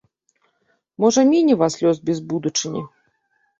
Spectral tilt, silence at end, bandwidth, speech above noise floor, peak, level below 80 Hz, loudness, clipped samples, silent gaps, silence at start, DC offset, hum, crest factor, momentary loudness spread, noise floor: -5 dB/octave; 0.7 s; 8 kHz; 49 dB; -4 dBFS; -64 dBFS; -19 LUFS; under 0.1%; none; 1 s; under 0.1%; none; 18 dB; 13 LU; -67 dBFS